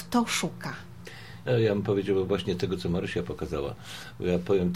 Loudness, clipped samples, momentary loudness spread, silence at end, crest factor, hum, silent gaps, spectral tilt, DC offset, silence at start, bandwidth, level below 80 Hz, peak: -29 LUFS; under 0.1%; 15 LU; 0 s; 16 dB; none; none; -5.5 dB/octave; 0.3%; 0 s; 16 kHz; -52 dBFS; -12 dBFS